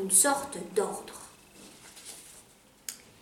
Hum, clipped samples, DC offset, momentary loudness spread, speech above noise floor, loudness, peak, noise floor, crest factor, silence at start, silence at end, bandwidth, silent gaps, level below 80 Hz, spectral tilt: none; under 0.1%; under 0.1%; 27 LU; 29 dB; -27 LUFS; -8 dBFS; -58 dBFS; 24 dB; 0 s; 0.25 s; 17.5 kHz; none; -70 dBFS; -1.5 dB/octave